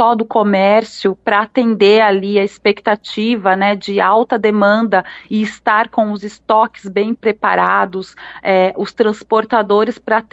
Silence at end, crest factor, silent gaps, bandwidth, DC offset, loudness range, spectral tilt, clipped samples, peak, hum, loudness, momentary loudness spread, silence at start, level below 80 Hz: 0.1 s; 14 dB; none; 8 kHz; under 0.1%; 2 LU; -6 dB/octave; under 0.1%; 0 dBFS; none; -14 LUFS; 7 LU; 0 s; -58 dBFS